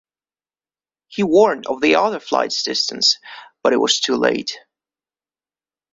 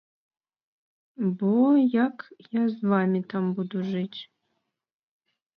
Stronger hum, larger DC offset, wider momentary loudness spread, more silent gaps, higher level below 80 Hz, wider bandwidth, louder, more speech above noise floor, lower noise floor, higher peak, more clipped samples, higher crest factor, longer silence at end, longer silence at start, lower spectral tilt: neither; neither; about the same, 11 LU vs 12 LU; neither; first, -62 dBFS vs -76 dBFS; first, 7.8 kHz vs 5.4 kHz; first, -17 LUFS vs -25 LUFS; first, over 72 dB vs 54 dB; first, under -90 dBFS vs -78 dBFS; first, -2 dBFS vs -10 dBFS; neither; about the same, 18 dB vs 16 dB; about the same, 1.35 s vs 1.35 s; about the same, 1.1 s vs 1.2 s; second, -2.5 dB/octave vs -10 dB/octave